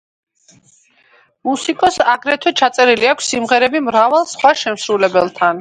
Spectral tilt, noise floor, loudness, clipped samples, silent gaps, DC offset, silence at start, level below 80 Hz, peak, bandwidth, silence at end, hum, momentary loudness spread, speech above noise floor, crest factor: -2.5 dB/octave; -53 dBFS; -14 LUFS; under 0.1%; none; under 0.1%; 1.45 s; -58 dBFS; 0 dBFS; 11 kHz; 0 s; none; 6 LU; 38 dB; 16 dB